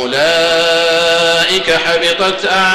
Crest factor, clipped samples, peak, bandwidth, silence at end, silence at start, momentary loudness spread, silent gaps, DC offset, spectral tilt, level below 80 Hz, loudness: 8 dB; under 0.1%; -4 dBFS; 15.5 kHz; 0 s; 0 s; 2 LU; none; under 0.1%; -2 dB/octave; -46 dBFS; -11 LUFS